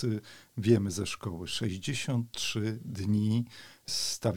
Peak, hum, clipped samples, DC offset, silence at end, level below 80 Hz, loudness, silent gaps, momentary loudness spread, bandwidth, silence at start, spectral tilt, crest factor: -10 dBFS; none; under 0.1%; 0.2%; 0 s; -60 dBFS; -32 LUFS; none; 10 LU; 18 kHz; 0 s; -5 dB/octave; 20 dB